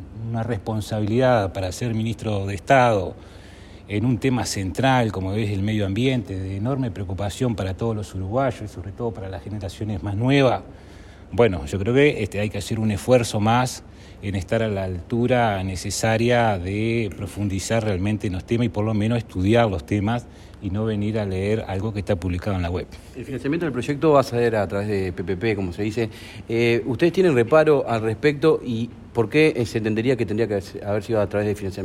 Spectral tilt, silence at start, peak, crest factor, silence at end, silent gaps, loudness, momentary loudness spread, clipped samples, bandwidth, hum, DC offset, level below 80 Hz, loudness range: -6.5 dB/octave; 0 s; -4 dBFS; 18 dB; 0 s; none; -22 LUFS; 11 LU; under 0.1%; 14 kHz; none; under 0.1%; -44 dBFS; 5 LU